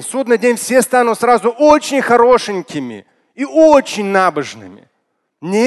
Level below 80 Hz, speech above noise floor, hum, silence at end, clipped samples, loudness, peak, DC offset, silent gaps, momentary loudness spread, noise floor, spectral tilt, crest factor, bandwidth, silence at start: -52 dBFS; 55 dB; none; 0 s; under 0.1%; -12 LUFS; 0 dBFS; under 0.1%; none; 15 LU; -68 dBFS; -4 dB/octave; 14 dB; 12.5 kHz; 0 s